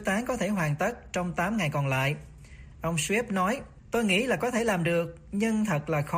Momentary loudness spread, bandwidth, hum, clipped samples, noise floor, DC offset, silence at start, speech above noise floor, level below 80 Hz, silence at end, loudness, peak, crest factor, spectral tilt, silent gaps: 7 LU; 15.5 kHz; none; under 0.1%; -47 dBFS; under 0.1%; 0 s; 20 dB; -52 dBFS; 0 s; -28 LUFS; -14 dBFS; 14 dB; -5 dB/octave; none